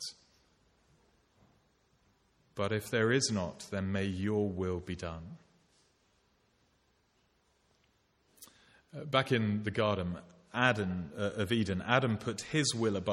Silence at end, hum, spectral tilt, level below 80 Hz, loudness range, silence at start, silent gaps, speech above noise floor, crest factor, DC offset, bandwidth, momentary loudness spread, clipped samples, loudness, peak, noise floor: 0 s; none; -5 dB/octave; -64 dBFS; 9 LU; 0 s; none; 40 dB; 26 dB; under 0.1%; 16 kHz; 13 LU; under 0.1%; -33 LUFS; -10 dBFS; -73 dBFS